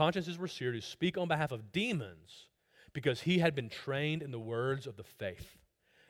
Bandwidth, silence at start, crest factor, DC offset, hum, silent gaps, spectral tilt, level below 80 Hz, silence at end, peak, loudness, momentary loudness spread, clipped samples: 16.5 kHz; 0 s; 20 dB; under 0.1%; none; none; -6 dB/octave; -68 dBFS; 0.6 s; -16 dBFS; -35 LUFS; 17 LU; under 0.1%